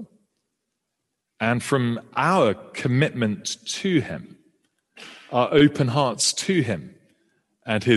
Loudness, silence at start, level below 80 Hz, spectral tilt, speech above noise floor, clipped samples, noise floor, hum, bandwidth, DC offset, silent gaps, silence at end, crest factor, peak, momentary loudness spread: -22 LUFS; 0 s; -60 dBFS; -4.5 dB/octave; 58 dB; under 0.1%; -80 dBFS; none; 12.5 kHz; under 0.1%; none; 0 s; 20 dB; -4 dBFS; 13 LU